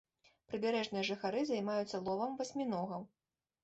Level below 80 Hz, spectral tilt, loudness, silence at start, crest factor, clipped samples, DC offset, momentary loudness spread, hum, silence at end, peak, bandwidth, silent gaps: -78 dBFS; -5 dB/octave; -38 LUFS; 0.5 s; 14 dB; under 0.1%; under 0.1%; 8 LU; none; 0.55 s; -24 dBFS; 8.2 kHz; none